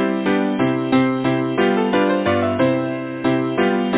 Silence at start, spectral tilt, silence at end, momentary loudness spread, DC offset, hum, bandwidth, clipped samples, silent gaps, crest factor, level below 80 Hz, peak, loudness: 0 s; -10.5 dB/octave; 0 s; 3 LU; under 0.1%; none; 4 kHz; under 0.1%; none; 14 dB; -50 dBFS; -4 dBFS; -19 LUFS